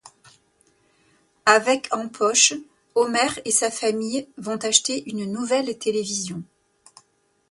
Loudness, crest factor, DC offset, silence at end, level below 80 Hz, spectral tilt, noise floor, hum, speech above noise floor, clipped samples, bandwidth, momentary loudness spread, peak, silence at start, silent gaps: -21 LUFS; 24 dB; under 0.1%; 1.1 s; -68 dBFS; -1.5 dB/octave; -64 dBFS; none; 42 dB; under 0.1%; 11.5 kHz; 12 LU; 0 dBFS; 0.05 s; none